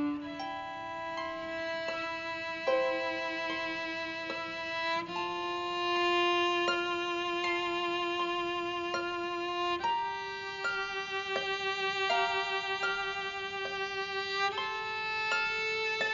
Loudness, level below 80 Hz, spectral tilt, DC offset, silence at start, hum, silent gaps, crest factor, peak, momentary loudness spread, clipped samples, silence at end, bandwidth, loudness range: -32 LUFS; -66 dBFS; 0 dB/octave; under 0.1%; 0 s; none; none; 16 dB; -18 dBFS; 7 LU; under 0.1%; 0 s; 7.2 kHz; 3 LU